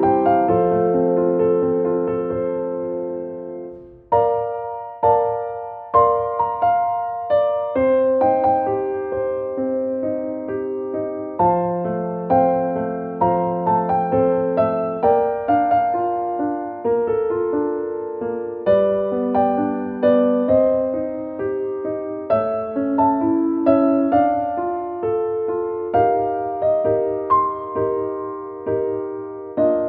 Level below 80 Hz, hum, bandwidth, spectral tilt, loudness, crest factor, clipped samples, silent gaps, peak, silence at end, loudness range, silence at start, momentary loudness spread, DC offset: -52 dBFS; none; 4.5 kHz; -11.5 dB/octave; -20 LUFS; 16 dB; under 0.1%; none; -2 dBFS; 0 s; 3 LU; 0 s; 9 LU; under 0.1%